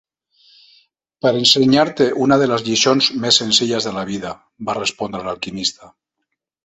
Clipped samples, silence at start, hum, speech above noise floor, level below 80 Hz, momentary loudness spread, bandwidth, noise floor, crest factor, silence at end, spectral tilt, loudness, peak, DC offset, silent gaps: under 0.1%; 1.25 s; none; 60 dB; -56 dBFS; 13 LU; 13 kHz; -77 dBFS; 18 dB; 0.75 s; -3.5 dB/octave; -16 LUFS; 0 dBFS; under 0.1%; none